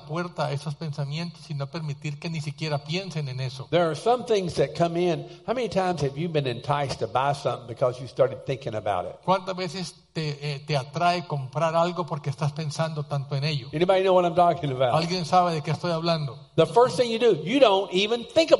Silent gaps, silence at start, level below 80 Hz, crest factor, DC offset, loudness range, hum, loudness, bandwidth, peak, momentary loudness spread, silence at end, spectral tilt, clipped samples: none; 0 s; -60 dBFS; 22 dB; under 0.1%; 6 LU; none; -25 LUFS; 11.5 kHz; -2 dBFS; 11 LU; 0 s; -6 dB/octave; under 0.1%